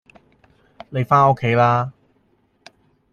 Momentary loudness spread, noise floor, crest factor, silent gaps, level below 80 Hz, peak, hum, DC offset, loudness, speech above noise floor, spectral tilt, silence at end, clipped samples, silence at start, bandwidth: 14 LU; -62 dBFS; 18 dB; none; -56 dBFS; -2 dBFS; none; under 0.1%; -18 LUFS; 46 dB; -8 dB/octave; 1.2 s; under 0.1%; 0.9 s; 7 kHz